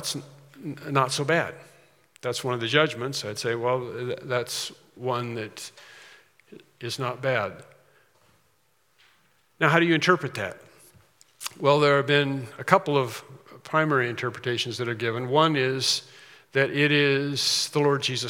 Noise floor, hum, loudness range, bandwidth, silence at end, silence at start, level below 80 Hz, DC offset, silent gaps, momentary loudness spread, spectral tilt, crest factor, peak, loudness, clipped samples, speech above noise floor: -68 dBFS; none; 9 LU; 17.5 kHz; 0 s; 0 s; -76 dBFS; under 0.1%; none; 14 LU; -4 dB/octave; 26 dB; 0 dBFS; -25 LUFS; under 0.1%; 43 dB